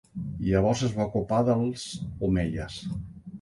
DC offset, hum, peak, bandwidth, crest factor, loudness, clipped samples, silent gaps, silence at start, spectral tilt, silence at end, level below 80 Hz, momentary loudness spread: under 0.1%; none; -10 dBFS; 11.5 kHz; 18 dB; -28 LUFS; under 0.1%; none; 0.15 s; -6.5 dB/octave; 0 s; -44 dBFS; 12 LU